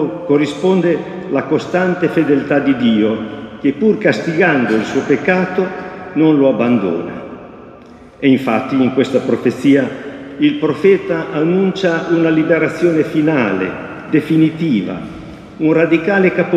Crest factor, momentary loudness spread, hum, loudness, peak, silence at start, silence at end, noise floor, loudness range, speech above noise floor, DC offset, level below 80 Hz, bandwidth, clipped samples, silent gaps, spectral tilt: 14 dB; 10 LU; none; -15 LUFS; 0 dBFS; 0 s; 0 s; -38 dBFS; 2 LU; 25 dB; under 0.1%; -52 dBFS; 9.2 kHz; under 0.1%; none; -7 dB/octave